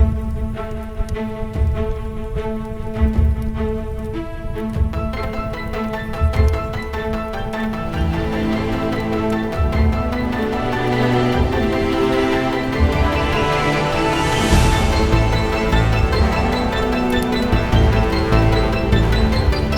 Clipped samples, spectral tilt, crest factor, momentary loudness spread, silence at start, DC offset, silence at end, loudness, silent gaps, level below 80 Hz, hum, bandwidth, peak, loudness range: under 0.1%; -6.5 dB/octave; 16 dB; 9 LU; 0 s; under 0.1%; 0 s; -19 LUFS; none; -22 dBFS; none; 17.5 kHz; -2 dBFS; 6 LU